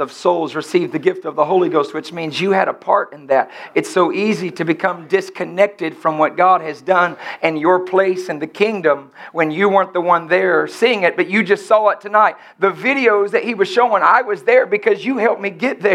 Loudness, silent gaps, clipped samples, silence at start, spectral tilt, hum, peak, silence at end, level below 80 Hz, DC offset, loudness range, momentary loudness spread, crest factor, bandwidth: -16 LUFS; none; under 0.1%; 0 s; -5.5 dB/octave; none; 0 dBFS; 0 s; -76 dBFS; under 0.1%; 3 LU; 6 LU; 16 dB; 12.5 kHz